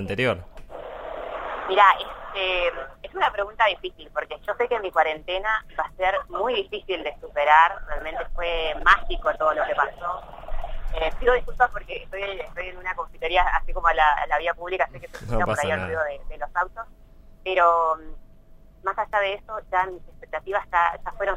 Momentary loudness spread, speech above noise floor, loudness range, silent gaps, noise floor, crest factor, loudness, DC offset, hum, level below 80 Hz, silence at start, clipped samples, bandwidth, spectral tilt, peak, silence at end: 16 LU; 24 dB; 5 LU; none; -48 dBFS; 22 dB; -24 LUFS; under 0.1%; none; -36 dBFS; 0 s; under 0.1%; 11.5 kHz; -4.5 dB/octave; -2 dBFS; 0 s